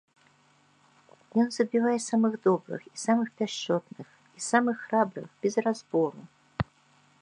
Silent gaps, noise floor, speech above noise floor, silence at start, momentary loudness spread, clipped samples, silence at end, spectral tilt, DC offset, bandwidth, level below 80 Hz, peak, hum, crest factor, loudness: none; -64 dBFS; 36 dB; 1.35 s; 12 LU; under 0.1%; 0.6 s; -5 dB/octave; under 0.1%; 10.5 kHz; -60 dBFS; -8 dBFS; none; 22 dB; -28 LUFS